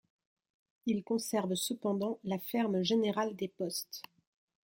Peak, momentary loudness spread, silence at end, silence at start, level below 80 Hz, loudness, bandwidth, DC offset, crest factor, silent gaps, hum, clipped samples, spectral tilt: -20 dBFS; 8 LU; 0.65 s; 0.85 s; -78 dBFS; -34 LUFS; 16.5 kHz; under 0.1%; 16 dB; none; none; under 0.1%; -4.5 dB/octave